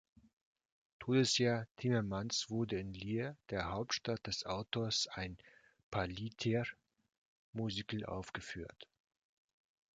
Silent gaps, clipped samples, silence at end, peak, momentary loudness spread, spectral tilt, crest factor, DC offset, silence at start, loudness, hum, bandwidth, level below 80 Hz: 1.71-1.75 s, 5.83-5.92 s, 7.18-7.53 s; under 0.1%; 1.1 s; -20 dBFS; 12 LU; -4.5 dB/octave; 20 dB; under 0.1%; 1 s; -39 LUFS; none; 9.4 kHz; -62 dBFS